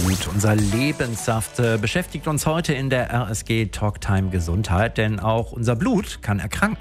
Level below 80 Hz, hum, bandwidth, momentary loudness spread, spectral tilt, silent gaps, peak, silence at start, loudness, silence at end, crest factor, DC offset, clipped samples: -38 dBFS; none; 16 kHz; 4 LU; -5.5 dB/octave; none; -4 dBFS; 0 s; -22 LUFS; 0 s; 18 dB; under 0.1%; under 0.1%